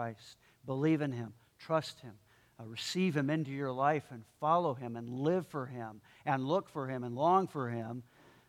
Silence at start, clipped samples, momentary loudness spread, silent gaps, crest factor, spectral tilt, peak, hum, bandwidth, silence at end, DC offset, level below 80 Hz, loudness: 0 s; under 0.1%; 17 LU; none; 20 dB; -6.5 dB/octave; -16 dBFS; none; 16 kHz; 0.45 s; under 0.1%; -76 dBFS; -34 LUFS